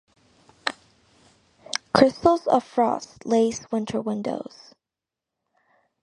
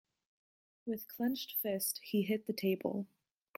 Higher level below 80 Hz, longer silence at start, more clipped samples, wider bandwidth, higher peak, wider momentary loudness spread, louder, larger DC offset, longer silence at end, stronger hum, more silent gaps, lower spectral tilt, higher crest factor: first, -58 dBFS vs -82 dBFS; second, 0.65 s vs 0.85 s; neither; second, 11 kHz vs 16.5 kHz; first, 0 dBFS vs -20 dBFS; first, 13 LU vs 8 LU; first, -24 LUFS vs -37 LUFS; neither; first, 1.6 s vs 0.5 s; neither; neither; about the same, -4.5 dB/octave vs -4.5 dB/octave; first, 26 dB vs 18 dB